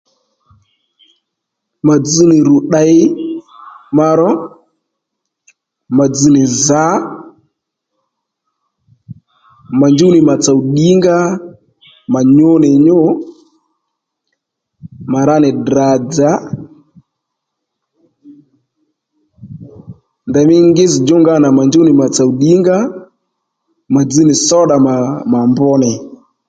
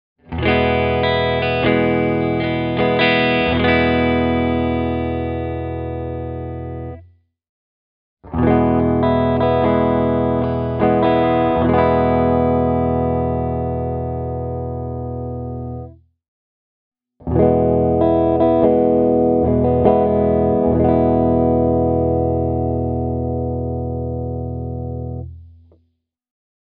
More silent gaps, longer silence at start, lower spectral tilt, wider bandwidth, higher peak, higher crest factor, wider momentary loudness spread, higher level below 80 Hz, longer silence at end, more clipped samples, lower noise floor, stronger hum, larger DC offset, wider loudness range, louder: second, none vs 7.49-8.17 s, 16.28-16.92 s; first, 1.85 s vs 0.3 s; about the same, -6 dB/octave vs -6 dB/octave; first, 9.2 kHz vs 5.2 kHz; about the same, 0 dBFS vs 0 dBFS; second, 12 dB vs 18 dB; about the same, 14 LU vs 12 LU; second, -52 dBFS vs -34 dBFS; second, 0.35 s vs 1.3 s; neither; first, -75 dBFS vs -67 dBFS; neither; neither; second, 6 LU vs 10 LU; first, -10 LUFS vs -17 LUFS